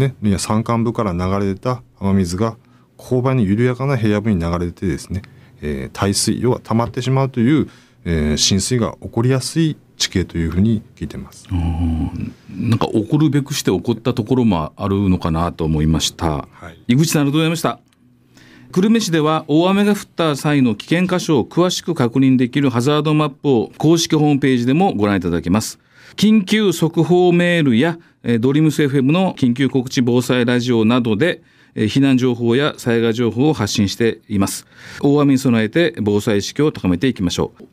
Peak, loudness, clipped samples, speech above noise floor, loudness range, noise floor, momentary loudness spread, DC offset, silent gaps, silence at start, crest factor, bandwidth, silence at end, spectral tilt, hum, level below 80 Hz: -2 dBFS; -17 LUFS; under 0.1%; 36 dB; 4 LU; -52 dBFS; 8 LU; under 0.1%; none; 0 s; 14 dB; 16 kHz; 0.1 s; -5.5 dB/octave; none; -38 dBFS